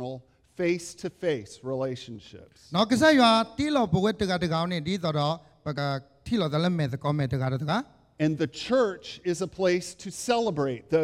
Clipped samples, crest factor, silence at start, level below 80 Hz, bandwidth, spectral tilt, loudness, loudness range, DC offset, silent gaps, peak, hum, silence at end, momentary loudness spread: under 0.1%; 20 dB; 0 s; -58 dBFS; 15 kHz; -5.5 dB/octave; -27 LUFS; 4 LU; under 0.1%; none; -8 dBFS; none; 0 s; 13 LU